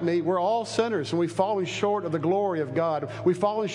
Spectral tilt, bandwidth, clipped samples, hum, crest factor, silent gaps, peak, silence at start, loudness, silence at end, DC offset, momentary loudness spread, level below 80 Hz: -6 dB/octave; 11 kHz; under 0.1%; none; 16 dB; none; -10 dBFS; 0 s; -26 LUFS; 0 s; under 0.1%; 2 LU; -70 dBFS